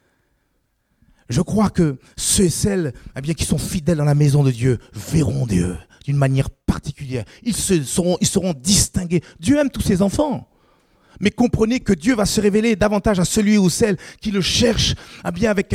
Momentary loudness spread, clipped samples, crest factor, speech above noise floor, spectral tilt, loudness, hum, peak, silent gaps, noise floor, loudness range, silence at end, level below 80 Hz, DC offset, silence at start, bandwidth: 9 LU; under 0.1%; 18 dB; 49 dB; -5 dB/octave; -19 LUFS; none; -2 dBFS; none; -67 dBFS; 3 LU; 0 s; -36 dBFS; under 0.1%; 1.3 s; 16 kHz